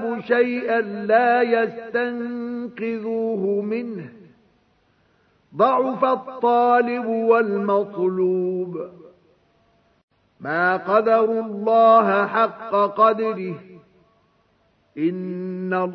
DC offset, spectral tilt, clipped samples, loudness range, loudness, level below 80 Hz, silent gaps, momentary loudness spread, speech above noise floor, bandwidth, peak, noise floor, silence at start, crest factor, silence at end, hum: under 0.1%; -9 dB/octave; under 0.1%; 7 LU; -20 LUFS; -74 dBFS; 10.03-10.08 s; 13 LU; 43 dB; 5.8 kHz; -4 dBFS; -63 dBFS; 0 s; 18 dB; 0 s; none